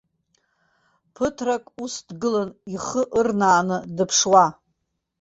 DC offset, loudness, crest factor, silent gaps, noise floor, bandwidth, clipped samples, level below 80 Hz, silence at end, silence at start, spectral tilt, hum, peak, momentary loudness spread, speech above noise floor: under 0.1%; -21 LUFS; 20 dB; none; -75 dBFS; 8 kHz; under 0.1%; -58 dBFS; 0.7 s; 1.2 s; -3.5 dB/octave; none; -2 dBFS; 15 LU; 54 dB